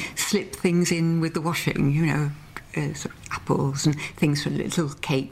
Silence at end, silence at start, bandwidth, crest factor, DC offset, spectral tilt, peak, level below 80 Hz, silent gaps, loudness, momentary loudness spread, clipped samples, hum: 0 s; 0 s; 16 kHz; 16 dB; under 0.1%; -5 dB/octave; -10 dBFS; -50 dBFS; none; -25 LUFS; 9 LU; under 0.1%; none